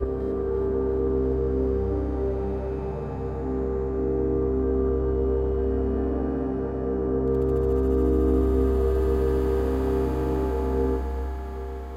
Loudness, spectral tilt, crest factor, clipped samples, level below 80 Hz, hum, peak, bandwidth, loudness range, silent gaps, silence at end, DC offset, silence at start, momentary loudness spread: -26 LUFS; -10 dB/octave; 14 dB; under 0.1%; -30 dBFS; none; -10 dBFS; 5 kHz; 4 LU; none; 0 s; under 0.1%; 0 s; 7 LU